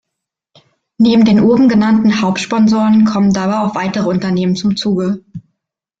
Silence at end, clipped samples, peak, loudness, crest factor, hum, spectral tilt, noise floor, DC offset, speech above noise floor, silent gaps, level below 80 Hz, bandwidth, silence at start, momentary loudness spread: 0.6 s; under 0.1%; -2 dBFS; -12 LUFS; 10 dB; none; -6.5 dB/octave; -78 dBFS; under 0.1%; 67 dB; none; -48 dBFS; 7.8 kHz; 1 s; 7 LU